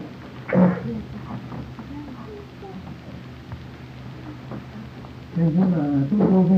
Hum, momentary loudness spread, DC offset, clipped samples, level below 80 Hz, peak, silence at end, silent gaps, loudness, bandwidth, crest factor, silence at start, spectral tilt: none; 19 LU; under 0.1%; under 0.1%; -48 dBFS; -4 dBFS; 0 s; none; -22 LUFS; 6 kHz; 20 dB; 0 s; -10 dB/octave